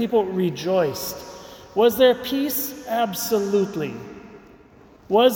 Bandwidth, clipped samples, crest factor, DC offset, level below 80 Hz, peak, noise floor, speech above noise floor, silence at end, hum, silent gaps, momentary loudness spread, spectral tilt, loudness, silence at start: 19 kHz; under 0.1%; 18 dB; under 0.1%; -58 dBFS; -4 dBFS; -49 dBFS; 29 dB; 0 s; none; none; 19 LU; -4.5 dB/octave; -22 LUFS; 0 s